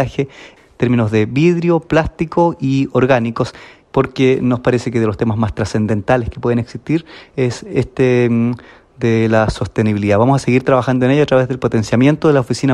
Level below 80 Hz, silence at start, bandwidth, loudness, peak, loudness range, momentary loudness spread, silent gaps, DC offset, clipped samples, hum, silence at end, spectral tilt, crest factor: -40 dBFS; 0 s; 11 kHz; -15 LUFS; 0 dBFS; 3 LU; 7 LU; none; under 0.1%; under 0.1%; none; 0 s; -7.5 dB/octave; 14 dB